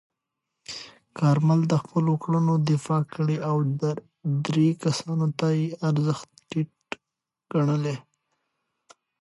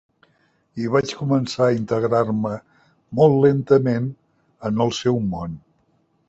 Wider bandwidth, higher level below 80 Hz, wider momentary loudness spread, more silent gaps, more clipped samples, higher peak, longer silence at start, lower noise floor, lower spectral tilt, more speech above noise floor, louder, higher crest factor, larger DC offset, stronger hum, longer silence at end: first, 11.5 kHz vs 8 kHz; second, -70 dBFS vs -52 dBFS; about the same, 16 LU vs 14 LU; neither; neither; second, -10 dBFS vs -2 dBFS; about the same, 0.7 s vs 0.75 s; first, -86 dBFS vs -64 dBFS; about the same, -7.5 dB/octave vs -7 dB/octave; first, 63 dB vs 45 dB; second, -25 LUFS vs -20 LUFS; about the same, 16 dB vs 20 dB; neither; neither; first, 1.2 s vs 0.7 s